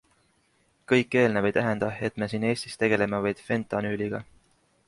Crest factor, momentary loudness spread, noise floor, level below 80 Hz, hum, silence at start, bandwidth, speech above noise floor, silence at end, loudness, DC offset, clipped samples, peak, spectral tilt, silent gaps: 20 dB; 7 LU; -67 dBFS; -60 dBFS; none; 0.9 s; 11.5 kHz; 42 dB; 0.65 s; -26 LUFS; under 0.1%; under 0.1%; -8 dBFS; -6 dB/octave; none